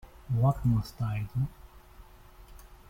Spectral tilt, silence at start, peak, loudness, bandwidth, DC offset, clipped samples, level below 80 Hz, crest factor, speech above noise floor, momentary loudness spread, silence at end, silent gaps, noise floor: -8.5 dB/octave; 0.05 s; -14 dBFS; -30 LUFS; 16 kHz; under 0.1%; under 0.1%; -48 dBFS; 18 dB; 24 dB; 8 LU; 0.15 s; none; -52 dBFS